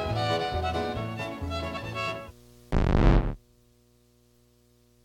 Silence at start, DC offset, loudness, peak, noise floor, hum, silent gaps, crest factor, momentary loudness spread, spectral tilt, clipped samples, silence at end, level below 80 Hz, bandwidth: 0 s; under 0.1%; -29 LUFS; -6 dBFS; -62 dBFS; 60 Hz at -55 dBFS; none; 24 dB; 12 LU; -6.5 dB/octave; under 0.1%; 1.65 s; -32 dBFS; 12 kHz